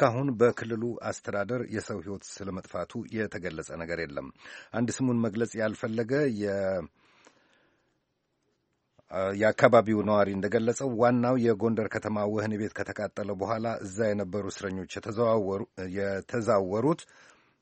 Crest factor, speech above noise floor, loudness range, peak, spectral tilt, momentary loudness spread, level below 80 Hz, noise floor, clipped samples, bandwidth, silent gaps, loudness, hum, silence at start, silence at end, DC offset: 26 dB; 48 dB; 9 LU; -2 dBFS; -6.5 dB/octave; 12 LU; -64 dBFS; -77 dBFS; under 0.1%; 8.4 kHz; none; -29 LUFS; none; 0 s; 0.6 s; under 0.1%